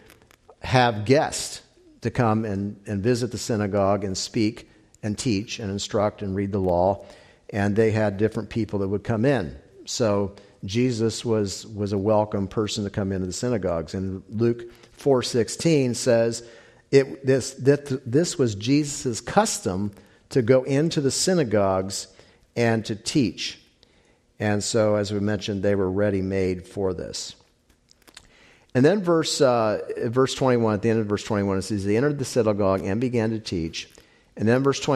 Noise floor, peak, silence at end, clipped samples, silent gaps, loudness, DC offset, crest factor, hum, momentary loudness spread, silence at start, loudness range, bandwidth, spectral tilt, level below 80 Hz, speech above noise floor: -61 dBFS; -4 dBFS; 0 s; under 0.1%; none; -24 LUFS; under 0.1%; 20 dB; none; 10 LU; 0.65 s; 3 LU; 14 kHz; -5.5 dB/octave; -56 dBFS; 38 dB